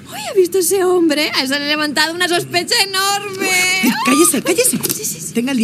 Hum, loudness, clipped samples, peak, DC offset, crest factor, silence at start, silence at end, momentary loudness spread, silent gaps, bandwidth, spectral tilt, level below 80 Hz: none; -14 LUFS; under 0.1%; 0 dBFS; under 0.1%; 16 dB; 0 s; 0 s; 6 LU; none; 16 kHz; -2 dB/octave; -60 dBFS